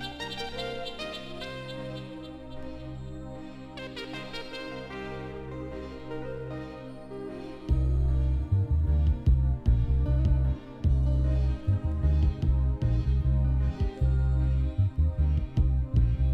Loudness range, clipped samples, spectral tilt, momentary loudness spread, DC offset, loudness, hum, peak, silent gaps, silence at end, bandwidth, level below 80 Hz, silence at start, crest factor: 12 LU; under 0.1%; -8 dB/octave; 14 LU; under 0.1%; -29 LUFS; none; -12 dBFS; none; 0 s; 6 kHz; -28 dBFS; 0 s; 16 dB